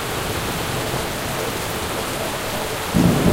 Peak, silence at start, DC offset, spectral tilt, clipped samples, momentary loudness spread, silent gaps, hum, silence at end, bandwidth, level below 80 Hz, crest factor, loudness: -2 dBFS; 0 s; under 0.1%; -4.5 dB/octave; under 0.1%; 6 LU; none; none; 0 s; 16 kHz; -36 dBFS; 18 dB; -22 LUFS